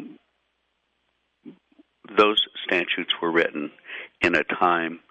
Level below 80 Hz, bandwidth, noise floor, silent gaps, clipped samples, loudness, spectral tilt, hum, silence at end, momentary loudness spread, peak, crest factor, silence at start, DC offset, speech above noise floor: -62 dBFS; 10.5 kHz; -73 dBFS; none; under 0.1%; -22 LUFS; -4.5 dB/octave; none; 0.1 s; 15 LU; -6 dBFS; 20 dB; 0 s; under 0.1%; 50 dB